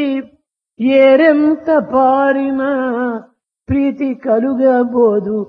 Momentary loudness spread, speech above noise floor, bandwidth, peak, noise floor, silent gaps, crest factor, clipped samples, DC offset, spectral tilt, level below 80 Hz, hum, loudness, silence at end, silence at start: 10 LU; 44 dB; 5 kHz; 0 dBFS; -56 dBFS; none; 14 dB; under 0.1%; under 0.1%; -9 dB/octave; -48 dBFS; none; -13 LUFS; 0 s; 0 s